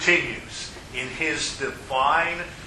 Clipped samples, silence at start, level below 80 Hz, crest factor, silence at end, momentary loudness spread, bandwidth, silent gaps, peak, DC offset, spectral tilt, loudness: under 0.1%; 0 s; -48 dBFS; 22 dB; 0 s; 12 LU; 13 kHz; none; -4 dBFS; under 0.1%; -2.5 dB/octave; -25 LUFS